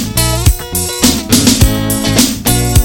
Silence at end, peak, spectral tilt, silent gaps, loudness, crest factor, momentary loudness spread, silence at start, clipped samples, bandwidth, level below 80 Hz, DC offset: 0 s; 0 dBFS; -4 dB/octave; none; -11 LUFS; 10 dB; 4 LU; 0 s; 0.2%; 17.5 kHz; -18 dBFS; under 0.1%